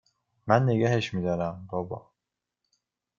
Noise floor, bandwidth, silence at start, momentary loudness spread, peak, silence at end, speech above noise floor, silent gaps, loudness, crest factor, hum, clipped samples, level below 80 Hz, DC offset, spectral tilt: -87 dBFS; 7.4 kHz; 0.45 s; 16 LU; -4 dBFS; 1.2 s; 61 dB; none; -27 LUFS; 24 dB; none; under 0.1%; -62 dBFS; under 0.1%; -7 dB/octave